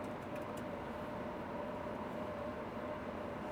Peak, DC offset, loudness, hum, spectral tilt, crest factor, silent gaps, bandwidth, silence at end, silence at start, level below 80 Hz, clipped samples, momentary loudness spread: -30 dBFS; under 0.1%; -44 LUFS; none; -6.5 dB/octave; 12 dB; none; over 20 kHz; 0 s; 0 s; -62 dBFS; under 0.1%; 1 LU